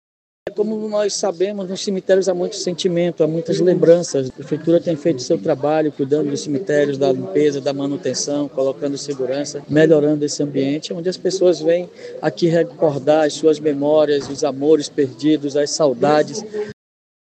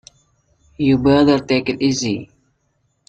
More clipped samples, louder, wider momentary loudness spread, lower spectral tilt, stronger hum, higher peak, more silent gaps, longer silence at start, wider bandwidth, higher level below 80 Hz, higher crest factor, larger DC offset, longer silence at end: neither; about the same, -18 LUFS vs -17 LUFS; about the same, 8 LU vs 9 LU; about the same, -5 dB/octave vs -5.5 dB/octave; neither; about the same, 0 dBFS vs -2 dBFS; neither; second, 0.45 s vs 0.8 s; about the same, 9 kHz vs 8.4 kHz; second, -66 dBFS vs -46 dBFS; about the same, 18 dB vs 16 dB; neither; second, 0.5 s vs 0.85 s